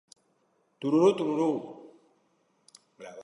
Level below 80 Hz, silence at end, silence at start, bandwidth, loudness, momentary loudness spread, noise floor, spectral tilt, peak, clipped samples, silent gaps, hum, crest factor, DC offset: -80 dBFS; 0 s; 0.8 s; 11 kHz; -27 LUFS; 23 LU; -71 dBFS; -7 dB/octave; -10 dBFS; under 0.1%; none; none; 20 dB; under 0.1%